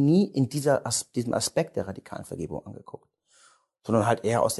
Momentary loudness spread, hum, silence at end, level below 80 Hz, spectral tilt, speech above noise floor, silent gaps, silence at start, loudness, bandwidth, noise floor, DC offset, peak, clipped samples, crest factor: 17 LU; none; 0 s; -58 dBFS; -5.5 dB/octave; 35 dB; none; 0 s; -26 LUFS; 12.5 kHz; -61 dBFS; under 0.1%; -8 dBFS; under 0.1%; 18 dB